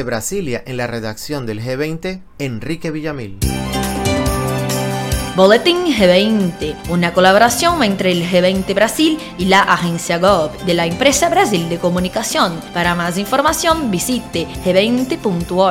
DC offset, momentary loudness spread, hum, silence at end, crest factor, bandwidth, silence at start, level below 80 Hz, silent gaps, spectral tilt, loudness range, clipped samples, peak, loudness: under 0.1%; 11 LU; none; 0 s; 16 dB; 17 kHz; 0 s; -34 dBFS; none; -4.5 dB/octave; 8 LU; under 0.1%; 0 dBFS; -15 LUFS